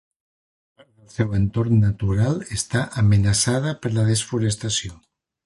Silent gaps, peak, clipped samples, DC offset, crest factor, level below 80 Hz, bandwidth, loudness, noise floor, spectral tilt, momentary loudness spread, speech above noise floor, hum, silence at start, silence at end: none; -6 dBFS; under 0.1%; under 0.1%; 14 dB; -40 dBFS; 11.5 kHz; -21 LUFS; under -90 dBFS; -5 dB/octave; 7 LU; over 70 dB; none; 1.2 s; 0.5 s